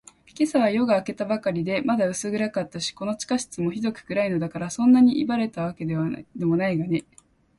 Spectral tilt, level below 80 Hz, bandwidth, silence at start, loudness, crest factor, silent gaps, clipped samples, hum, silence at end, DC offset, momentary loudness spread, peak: -5.5 dB/octave; -60 dBFS; 11.5 kHz; 0.4 s; -24 LUFS; 16 dB; none; under 0.1%; none; 0.6 s; under 0.1%; 10 LU; -8 dBFS